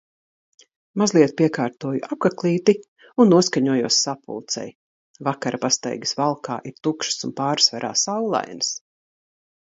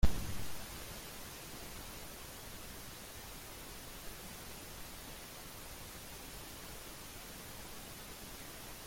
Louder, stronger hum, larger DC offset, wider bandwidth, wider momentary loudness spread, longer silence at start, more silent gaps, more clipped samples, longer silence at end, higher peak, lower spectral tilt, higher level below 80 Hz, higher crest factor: first, -21 LUFS vs -47 LUFS; neither; neither; second, 8 kHz vs 16.5 kHz; first, 11 LU vs 2 LU; first, 0.95 s vs 0 s; first, 2.88-2.96 s, 4.75-5.14 s vs none; neither; first, 0.85 s vs 0 s; first, -2 dBFS vs -16 dBFS; about the same, -4 dB/octave vs -3.5 dB/octave; second, -68 dBFS vs -48 dBFS; about the same, 20 dB vs 24 dB